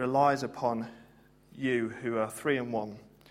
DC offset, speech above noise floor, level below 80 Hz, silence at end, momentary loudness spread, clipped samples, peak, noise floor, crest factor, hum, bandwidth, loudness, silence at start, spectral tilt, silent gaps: under 0.1%; 29 dB; -68 dBFS; 0.25 s; 14 LU; under 0.1%; -12 dBFS; -60 dBFS; 20 dB; none; 16 kHz; -31 LUFS; 0 s; -6 dB/octave; none